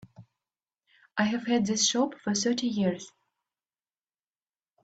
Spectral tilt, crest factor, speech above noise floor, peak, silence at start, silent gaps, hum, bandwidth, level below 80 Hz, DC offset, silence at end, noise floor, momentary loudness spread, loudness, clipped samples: -3.5 dB/octave; 20 dB; over 63 dB; -12 dBFS; 0.2 s; none; none; 9.2 kHz; -70 dBFS; under 0.1%; 1.75 s; under -90 dBFS; 11 LU; -27 LUFS; under 0.1%